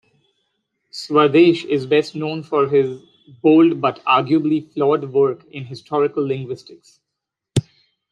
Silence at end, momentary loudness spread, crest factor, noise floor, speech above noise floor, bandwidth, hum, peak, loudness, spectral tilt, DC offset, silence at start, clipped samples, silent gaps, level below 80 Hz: 0.5 s; 18 LU; 16 dB; -82 dBFS; 64 dB; 10.5 kHz; none; -2 dBFS; -18 LUFS; -7 dB/octave; under 0.1%; 0.95 s; under 0.1%; none; -60 dBFS